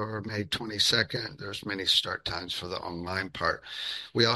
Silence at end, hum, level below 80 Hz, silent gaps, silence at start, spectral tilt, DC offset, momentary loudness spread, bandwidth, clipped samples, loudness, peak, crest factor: 0 s; none; -58 dBFS; none; 0 s; -3 dB/octave; under 0.1%; 11 LU; 12.5 kHz; under 0.1%; -29 LUFS; -6 dBFS; 24 dB